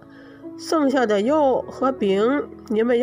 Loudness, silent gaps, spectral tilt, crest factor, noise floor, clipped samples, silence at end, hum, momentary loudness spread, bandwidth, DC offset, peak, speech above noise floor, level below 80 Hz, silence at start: -21 LUFS; none; -5.5 dB/octave; 14 dB; -40 dBFS; under 0.1%; 0 s; none; 12 LU; 16 kHz; under 0.1%; -8 dBFS; 21 dB; -58 dBFS; 0.15 s